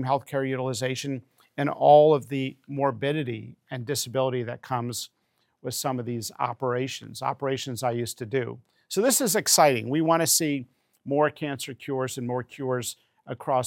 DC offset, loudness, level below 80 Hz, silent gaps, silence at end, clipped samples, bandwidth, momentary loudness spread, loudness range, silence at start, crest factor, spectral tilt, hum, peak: under 0.1%; -25 LUFS; -76 dBFS; none; 0 s; under 0.1%; 17 kHz; 16 LU; 7 LU; 0 s; 20 dB; -4 dB/octave; none; -6 dBFS